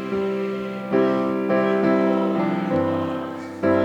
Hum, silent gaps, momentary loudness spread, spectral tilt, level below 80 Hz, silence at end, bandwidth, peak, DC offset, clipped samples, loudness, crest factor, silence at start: none; none; 8 LU; -8 dB/octave; -64 dBFS; 0 s; 8.8 kHz; -8 dBFS; under 0.1%; under 0.1%; -22 LUFS; 14 dB; 0 s